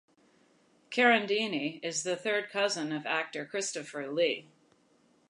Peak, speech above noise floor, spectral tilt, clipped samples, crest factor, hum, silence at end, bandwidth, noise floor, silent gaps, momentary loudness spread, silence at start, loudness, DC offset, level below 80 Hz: -12 dBFS; 36 dB; -2.5 dB/octave; under 0.1%; 22 dB; none; 0.85 s; 11 kHz; -67 dBFS; none; 11 LU; 0.9 s; -30 LUFS; under 0.1%; -86 dBFS